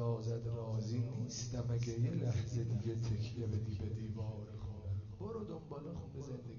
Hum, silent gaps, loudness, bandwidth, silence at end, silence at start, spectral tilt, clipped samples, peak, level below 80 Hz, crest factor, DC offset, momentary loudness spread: none; none; -41 LUFS; 7 kHz; 0 s; 0 s; -8.5 dB/octave; under 0.1%; -26 dBFS; -60 dBFS; 12 dB; under 0.1%; 9 LU